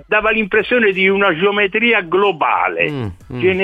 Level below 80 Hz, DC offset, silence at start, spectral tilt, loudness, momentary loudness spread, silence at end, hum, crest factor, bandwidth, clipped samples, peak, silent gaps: -46 dBFS; under 0.1%; 0.1 s; -7 dB/octave; -14 LUFS; 6 LU; 0 s; none; 14 dB; 5 kHz; under 0.1%; -2 dBFS; none